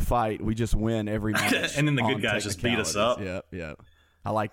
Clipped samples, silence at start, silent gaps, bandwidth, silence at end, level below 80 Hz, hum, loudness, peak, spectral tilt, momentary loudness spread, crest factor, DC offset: under 0.1%; 0 s; none; 17 kHz; 0.05 s; -38 dBFS; none; -26 LUFS; -12 dBFS; -4.5 dB/octave; 12 LU; 14 dB; under 0.1%